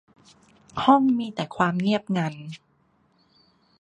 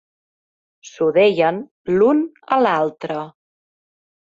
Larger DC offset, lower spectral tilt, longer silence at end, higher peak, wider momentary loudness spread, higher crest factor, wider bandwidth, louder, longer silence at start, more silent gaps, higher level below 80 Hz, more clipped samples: neither; about the same, -7 dB/octave vs -6 dB/octave; first, 1.25 s vs 1 s; about the same, -4 dBFS vs -4 dBFS; first, 21 LU vs 13 LU; first, 22 dB vs 16 dB; first, 9.6 kHz vs 7.6 kHz; second, -23 LUFS vs -18 LUFS; about the same, 0.75 s vs 0.85 s; second, none vs 1.71-1.85 s; about the same, -64 dBFS vs -62 dBFS; neither